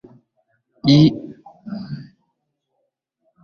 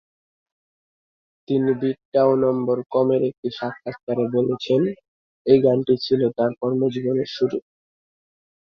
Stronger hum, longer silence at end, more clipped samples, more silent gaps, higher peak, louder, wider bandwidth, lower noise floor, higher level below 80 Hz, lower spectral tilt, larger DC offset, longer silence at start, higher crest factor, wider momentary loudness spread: neither; first, 1.4 s vs 1.1 s; neither; second, none vs 2.05-2.12 s, 3.38-3.43 s, 4.03-4.07 s, 5.08-5.45 s; about the same, -2 dBFS vs -4 dBFS; first, -15 LUFS vs -21 LUFS; about the same, 6.6 kHz vs 6.4 kHz; second, -74 dBFS vs under -90 dBFS; first, -54 dBFS vs -64 dBFS; about the same, -7.5 dB/octave vs -8.5 dB/octave; neither; second, 0.85 s vs 1.5 s; about the same, 20 dB vs 20 dB; first, 24 LU vs 11 LU